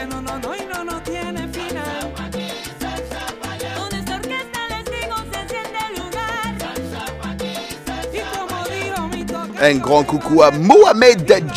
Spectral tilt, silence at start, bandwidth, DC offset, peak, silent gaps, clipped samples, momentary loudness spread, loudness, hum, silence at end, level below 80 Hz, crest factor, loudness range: -4.5 dB/octave; 0 s; 16 kHz; under 0.1%; 0 dBFS; none; under 0.1%; 16 LU; -19 LUFS; none; 0 s; -40 dBFS; 18 dB; 12 LU